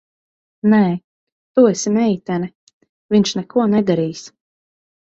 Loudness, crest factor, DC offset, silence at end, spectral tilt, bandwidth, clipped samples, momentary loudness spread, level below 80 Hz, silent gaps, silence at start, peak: -17 LUFS; 16 dB; under 0.1%; 0.8 s; -6 dB/octave; 8 kHz; under 0.1%; 10 LU; -60 dBFS; 1.04-1.55 s, 2.55-2.67 s, 2.73-2.81 s, 2.89-3.09 s; 0.65 s; -2 dBFS